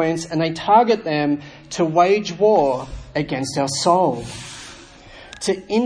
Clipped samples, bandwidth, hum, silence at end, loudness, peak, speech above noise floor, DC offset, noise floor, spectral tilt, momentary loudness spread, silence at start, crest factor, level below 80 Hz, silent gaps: under 0.1%; 10.5 kHz; none; 0 s; -19 LUFS; -2 dBFS; 23 dB; under 0.1%; -42 dBFS; -5 dB/octave; 16 LU; 0 s; 18 dB; -46 dBFS; none